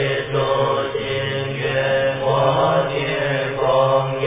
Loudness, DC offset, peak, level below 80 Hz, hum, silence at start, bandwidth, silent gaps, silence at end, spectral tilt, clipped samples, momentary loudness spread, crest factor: -19 LUFS; under 0.1%; -4 dBFS; -48 dBFS; none; 0 s; 3.8 kHz; none; 0 s; -9.5 dB/octave; under 0.1%; 6 LU; 14 dB